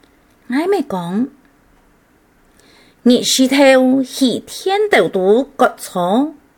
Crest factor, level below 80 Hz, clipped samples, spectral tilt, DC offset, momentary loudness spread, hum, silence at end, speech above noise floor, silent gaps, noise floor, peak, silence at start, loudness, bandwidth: 16 dB; -58 dBFS; under 0.1%; -4 dB/octave; under 0.1%; 11 LU; none; 0.25 s; 39 dB; none; -53 dBFS; 0 dBFS; 0.5 s; -15 LUFS; 18.5 kHz